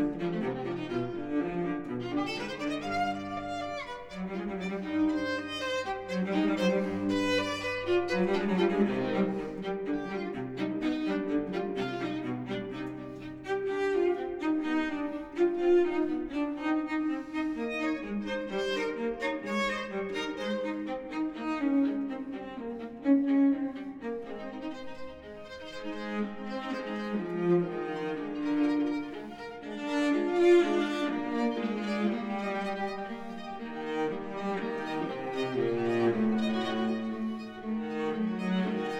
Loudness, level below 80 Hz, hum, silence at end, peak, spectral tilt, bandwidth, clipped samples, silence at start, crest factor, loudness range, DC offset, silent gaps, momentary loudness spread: -31 LUFS; -60 dBFS; none; 0 s; -14 dBFS; -6.5 dB/octave; 11 kHz; under 0.1%; 0 s; 18 dB; 5 LU; under 0.1%; none; 11 LU